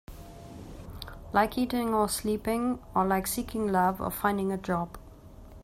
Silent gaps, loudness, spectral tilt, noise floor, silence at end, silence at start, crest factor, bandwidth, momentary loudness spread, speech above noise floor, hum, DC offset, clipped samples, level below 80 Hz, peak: none; -29 LUFS; -5 dB/octave; -49 dBFS; 0 s; 0.1 s; 20 dB; 16 kHz; 19 LU; 20 dB; none; under 0.1%; under 0.1%; -48 dBFS; -10 dBFS